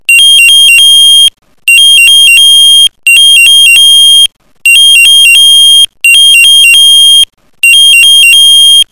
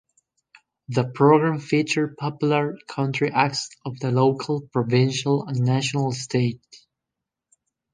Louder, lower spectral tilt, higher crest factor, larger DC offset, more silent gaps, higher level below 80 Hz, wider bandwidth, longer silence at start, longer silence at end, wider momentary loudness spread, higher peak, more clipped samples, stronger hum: first, 1 LUFS vs -22 LUFS; second, 6.5 dB/octave vs -6 dB/octave; second, 2 dB vs 20 dB; first, 3% vs under 0.1%; neither; first, -46 dBFS vs -64 dBFS; first, over 20 kHz vs 10 kHz; second, 0.1 s vs 0.9 s; second, 0.1 s vs 1.15 s; second, 4 LU vs 8 LU; about the same, 0 dBFS vs -2 dBFS; first, 30% vs under 0.1%; neither